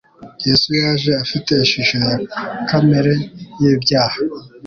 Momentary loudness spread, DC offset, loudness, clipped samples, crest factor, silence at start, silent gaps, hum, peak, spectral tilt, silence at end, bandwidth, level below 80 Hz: 9 LU; under 0.1%; -16 LUFS; under 0.1%; 14 dB; 0.2 s; none; none; -2 dBFS; -5.5 dB/octave; 0 s; 7 kHz; -48 dBFS